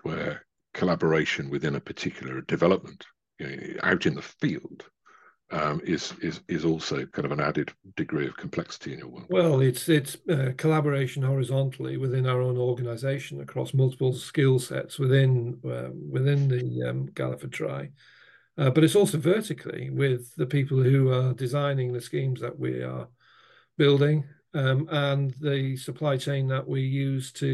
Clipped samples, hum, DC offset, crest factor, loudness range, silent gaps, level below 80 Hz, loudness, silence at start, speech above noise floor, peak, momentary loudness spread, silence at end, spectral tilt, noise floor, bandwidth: under 0.1%; none; under 0.1%; 18 dB; 5 LU; none; -66 dBFS; -27 LUFS; 0.05 s; 33 dB; -8 dBFS; 12 LU; 0 s; -6.5 dB/octave; -58 dBFS; 12.5 kHz